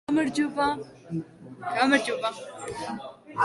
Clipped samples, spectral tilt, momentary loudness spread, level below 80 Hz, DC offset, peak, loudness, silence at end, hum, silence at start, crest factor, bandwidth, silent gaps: under 0.1%; -4.5 dB/octave; 16 LU; -62 dBFS; under 0.1%; -8 dBFS; -27 LUFS; 0 s; none; 0.1 s; 20 dB; 11.5 kHz; none